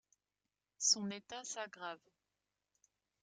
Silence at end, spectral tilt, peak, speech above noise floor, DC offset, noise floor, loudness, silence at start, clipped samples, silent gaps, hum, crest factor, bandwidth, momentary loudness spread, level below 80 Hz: 1.25 s; -1 dB/octave; -20 dBFS; over 50 dB; under 0.1%; under -90 dBFS; -37 LUFS; 0.8 s; under 0.1%; none; none; 24 dB; 10 kHz; 16 LU; -88 dBFS